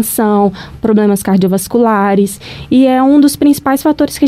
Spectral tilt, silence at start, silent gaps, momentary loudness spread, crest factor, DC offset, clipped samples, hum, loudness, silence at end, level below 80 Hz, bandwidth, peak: -6 dB/octave; 0 s; none; 6 LU; 10 dB; under 0.1%; under 0.1%; none; -11 LUFS; 0 s; -40 dBFS; 16 kHz; 0 dBFS